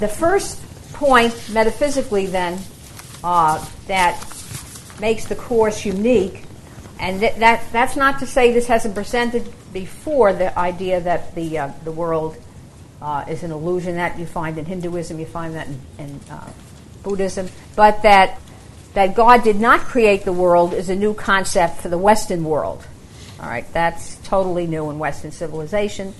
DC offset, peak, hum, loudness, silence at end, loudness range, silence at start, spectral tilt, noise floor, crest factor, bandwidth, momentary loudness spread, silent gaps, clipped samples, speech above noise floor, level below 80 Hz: under 0.1%; 0 dBFS; none; -18 LUFS; 0 s; 10 LU; 0 s; -4.5 dB/octave; -40 dBFS; 18 dB; 12.5 kHz; 18 LU; none; under 0.1%; 23 dB; -36 dBFS